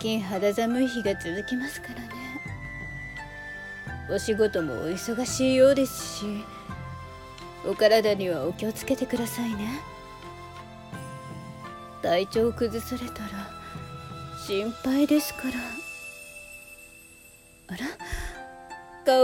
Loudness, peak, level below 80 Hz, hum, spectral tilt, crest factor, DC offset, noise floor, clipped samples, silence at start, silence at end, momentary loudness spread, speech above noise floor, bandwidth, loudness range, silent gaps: -28 LUFS; -8 dBFS; -50 dBFS; none; -4.5 dB/octave; 20 dB; under 0.1%; -52 dBFS; under 0.1%; 0 s; 0 s; 19 LU; 26 dB; 17.5 kHz; 8 LU; none